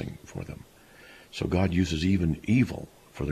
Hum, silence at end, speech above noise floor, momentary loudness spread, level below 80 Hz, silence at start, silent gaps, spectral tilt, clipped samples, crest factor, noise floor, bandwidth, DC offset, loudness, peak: none; 0 s; 27 dB; 16 LU; -44 dBFS; 0 s; none; -6.5 dB/octave; under 0.1%; 16 dB; -53 dBFS; 14 kHz; under 0.1%; -27 LUFS; -12 dBFS